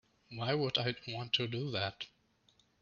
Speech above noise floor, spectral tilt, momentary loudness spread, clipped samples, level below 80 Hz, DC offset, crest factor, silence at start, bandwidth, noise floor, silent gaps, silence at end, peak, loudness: 35 dB; -5.5 dB/octave; 15 LU; under 0.1%; -72 dBFS; under 0.1%; 20 dB; 0.3 s; 7.2 kHz; -71 dBFS; none; 0.75 s; -18 dBFS; -35 LUFS